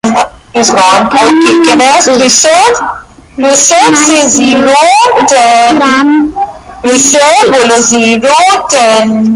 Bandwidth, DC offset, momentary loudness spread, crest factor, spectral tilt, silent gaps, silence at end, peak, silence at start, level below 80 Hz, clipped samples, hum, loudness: 16 kHz; under 0.1%; 9 LU; 6 dB; -2 dB/octave; none; 0 s; 0 dBFS; 0.05 s; -42 dBFS; 0.4%; none; -5 LUFS